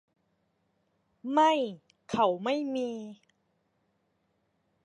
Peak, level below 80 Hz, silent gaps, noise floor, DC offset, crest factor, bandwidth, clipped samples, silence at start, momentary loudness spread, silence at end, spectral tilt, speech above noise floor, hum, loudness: -12 dBFS; -74 dBFS; none; -75 dBFS; under 0.1%; 22 dB; 11 kHz; under 0.1%; 1.25 s; 18 LU; 1.7 s; -5 dB/octave; 47 dB; none; -29 LUFS